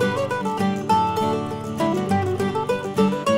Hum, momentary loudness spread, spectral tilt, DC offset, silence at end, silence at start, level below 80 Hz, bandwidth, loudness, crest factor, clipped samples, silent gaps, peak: none; 4 LU; -6 dB/octave; under 0.1%; 0 s; 0 s; -58 dBFS; 16 kHz; -22 LUFS; 16 dB; under 0.1%; none; -6 dBFS